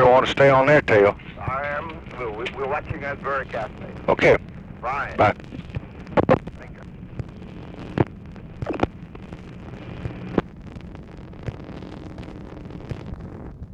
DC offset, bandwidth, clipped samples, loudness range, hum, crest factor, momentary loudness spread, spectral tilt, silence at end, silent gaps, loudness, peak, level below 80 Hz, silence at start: under 0.1%; 9 kHz; under 0.1%; 12 LU; none; 20 dB; 23 LU; -7 dB/octave; 0 s; none; -22 LUFS; -4 dBFS; -42 dBFS; 0 s